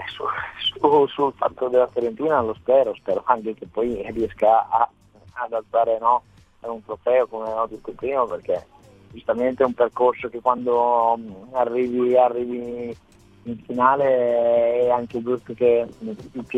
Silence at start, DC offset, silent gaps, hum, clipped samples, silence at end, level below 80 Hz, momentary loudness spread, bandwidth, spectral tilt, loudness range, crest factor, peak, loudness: 0 s; under 0.1%; none; none; under 0.1%; 0 s; -56 dBFS; 13 LU; 7.6 kHz; -6.5 dB/octave; 3 LU; 20 dB; -2 dBFS; -21 LUFS